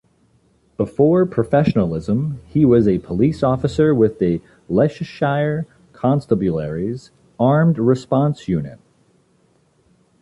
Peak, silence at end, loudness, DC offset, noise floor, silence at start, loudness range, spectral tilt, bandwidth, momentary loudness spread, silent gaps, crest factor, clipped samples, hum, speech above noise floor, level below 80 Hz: -4 dBFS; 1.45 s; -18 LUFS; under 0.1%; -59 dBFS; 0.8 s; 4 LU; -9 dB/octave; 11 kHz; 10 LU; none; 16 dB; under 0.1%; none; 42 dB; -44 dBFS